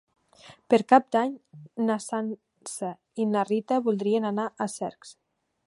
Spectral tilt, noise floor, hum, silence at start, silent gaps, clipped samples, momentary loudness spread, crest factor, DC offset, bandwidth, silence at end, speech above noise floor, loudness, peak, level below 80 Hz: -5.5 dB/octave; -53 dBFS; none; 0.45 s; none; under 0.1%; 15 LU; 24 dB; under 0.1%; 11.5 kHz; 0.55 s; 27 dB; -26 LUFS; -4 dBFS; -78 dBFS